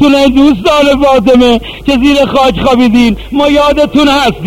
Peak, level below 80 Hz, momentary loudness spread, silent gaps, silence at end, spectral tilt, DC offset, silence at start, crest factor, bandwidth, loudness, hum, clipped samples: 0 dBFS; -26 dBFS; 4 LU; none; 0 s; -5 dB/octave; 1%; 0 s; 6 dB; 16 kHz; -7 LUFS; none; 0.9%